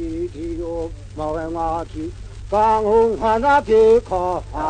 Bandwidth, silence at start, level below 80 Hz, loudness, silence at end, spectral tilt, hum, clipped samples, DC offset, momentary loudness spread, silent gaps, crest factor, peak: 9.4 kHz; 0 s; -36 dBFS; -19 LUFS; 0 s; -6.5 dB/octave; none; under 0.1%; under 0.1%; 16 LU; none; 14 dB; -4 dBFS